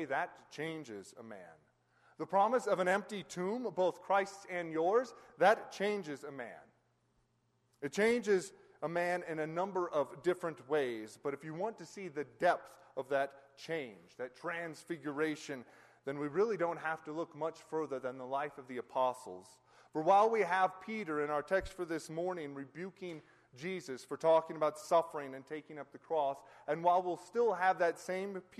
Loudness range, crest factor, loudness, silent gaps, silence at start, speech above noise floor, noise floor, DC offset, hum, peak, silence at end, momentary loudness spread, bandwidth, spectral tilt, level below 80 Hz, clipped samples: 5 LU; 20 dB; -36 LUFS; none; 0 s; 41 dB; -77 dBFS; under 0.1%; none; -16 dBFS; 0.2 s; 16 LU; 13 kHz; -5 dB/octave; -72 dBFS; under 0.1%